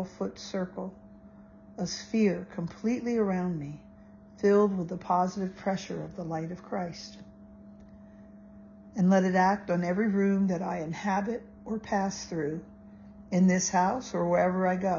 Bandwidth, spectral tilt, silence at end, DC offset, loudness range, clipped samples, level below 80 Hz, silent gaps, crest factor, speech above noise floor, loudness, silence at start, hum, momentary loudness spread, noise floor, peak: 7.4 kHz; -6 dB/octave; 0 s; under 0.1%; 6 LU; under 0.1%; -60 dBFS; none; 18 dB; 24 dB; -29 LUFS; 0 s; none; 14 LU; -52 dBFS; -12 dBFS